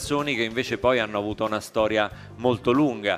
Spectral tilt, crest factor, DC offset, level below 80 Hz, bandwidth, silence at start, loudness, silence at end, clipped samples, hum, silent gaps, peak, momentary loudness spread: -5 dB/octave; 18 dB; under 0.1%; -50 dBFS; 15.5 kHz; 0 s; -24 LUFS; 0 s; under 0.1%; none; none; -6 dBFS; 5 LU